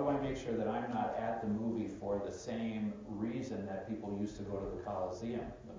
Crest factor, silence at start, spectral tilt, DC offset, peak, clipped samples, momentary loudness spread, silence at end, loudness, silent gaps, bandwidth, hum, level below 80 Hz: 16 dB; 0 s; -7 dB/octave; under 0.1%; -22 dBFS; under 0.1%; 5 LU; 0 s; -39 LUFS; none; 7.6 kHz; none; -58 dBFS